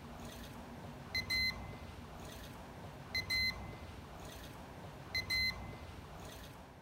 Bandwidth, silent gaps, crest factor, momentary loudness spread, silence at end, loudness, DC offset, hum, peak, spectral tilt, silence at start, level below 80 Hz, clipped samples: 16 kHz; none; 18 dB; 16 LU; 0 s; -40 LUFS; under 0.1%; none; -26 dBFS; -3 dB/octave; 0 s; -56 dBFS; under 0.1%